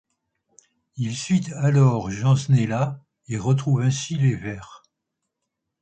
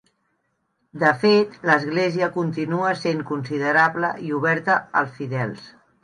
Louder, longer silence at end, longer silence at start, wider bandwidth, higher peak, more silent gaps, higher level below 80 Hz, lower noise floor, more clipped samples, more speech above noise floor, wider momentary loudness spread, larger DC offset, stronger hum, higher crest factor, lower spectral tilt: about the same, -22 LUFS vs -21 LUFS; first, 1.05 s vs 0.35 s; about the same, 0.95 s vs 0.95 s; second, 9 kHz vs 10.5 kHz; about the same, -6 dBFS vs -4 dBFS; neither; first, -54 dBFS vs -68 dBFS; first, -81 dBFS vs -71 dBFS; neither; first, 60 dB vs 50 dB; first, 14 LU vs 9 LU; neither; neither; about the same, 16 dB vs 18 dB; about the same, -6.5 dB/octave vs -6.5 dB/octave